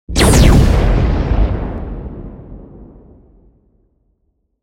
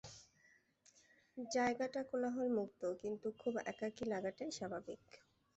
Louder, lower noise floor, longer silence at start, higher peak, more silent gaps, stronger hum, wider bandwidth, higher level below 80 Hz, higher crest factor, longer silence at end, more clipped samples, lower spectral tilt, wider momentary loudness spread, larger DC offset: first, -13 LUFS vs -42 LUFS; second, -64 dBFS vs -73 dBFS; about the same, 0.1 s vs 0.05 s; first, 0 dBFS vs -26 dBFS; neither; neither; first, 16.5 kHz vs 8.2 kHz; first, -18 dBFS vs -78 dBFS; about the same, 14 dB vs 16 dB; first, 1.8 s vs 0.4 s; neither; about the same, -5.5 dB/octave vs -4.5 dB/octave; first, 25 LU vs 15 LU; neither